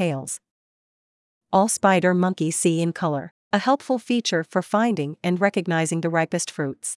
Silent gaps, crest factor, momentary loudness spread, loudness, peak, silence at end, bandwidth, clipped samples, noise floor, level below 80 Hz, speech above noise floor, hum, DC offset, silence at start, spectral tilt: 0.51-1.41 s, 3.31-3.51 s; 18 dB; 8 LU; -22 LUFS; -4 dBFS; 0 s; 12 kHz; under 0.1%; under -90 dBFS; -72 dBFS; over 68 dB; none; under 0.1%; 0 s; -5 dB/octave